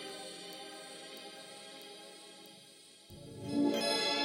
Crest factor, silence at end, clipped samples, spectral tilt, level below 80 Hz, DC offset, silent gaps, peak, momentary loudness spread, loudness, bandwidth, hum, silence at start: 18 dB; 0 s; under 0.1%; -3 dB/octave; -76 dBFS; under 0.1%; none; -20 dBFS; 22 LU; -38 LUFS; 16.5 kHz; none; 0 s